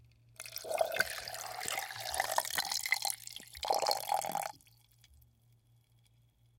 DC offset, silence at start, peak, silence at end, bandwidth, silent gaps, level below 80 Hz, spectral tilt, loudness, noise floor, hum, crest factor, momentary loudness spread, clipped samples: under 0.1%; 0.4 s; -12 dBFS; 2 s; 17 kHz; none; -68 dBFS; 0 dB/octave; -35 LUFS; -68 dBFS; none; 28 dB; 11 LU; under 0.1%